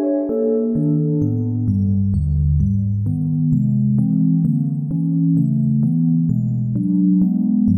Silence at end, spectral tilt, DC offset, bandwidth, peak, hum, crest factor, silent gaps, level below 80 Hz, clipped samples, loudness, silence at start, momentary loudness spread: 0 s; -14 dB/octave; under 0.1%; 1.8 kHz; -6 dBFS; none; 10 dB; none; -32 dBFS; under 0.1%; -18 LUFS; 0 s; 4 LU